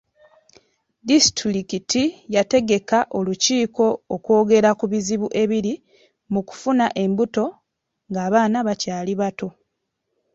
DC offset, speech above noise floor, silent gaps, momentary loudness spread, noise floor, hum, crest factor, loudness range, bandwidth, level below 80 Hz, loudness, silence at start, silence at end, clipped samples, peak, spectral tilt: under 0.1%; 57 dB; none; 11 LU; -76 dBFS; none; 18 dB; 4 LU; 8 kHz; -58 dBFS; -20 LUFS; 1.05 s; 0.85 s; under 0.1%; -4 dBFS; -4 dB/octave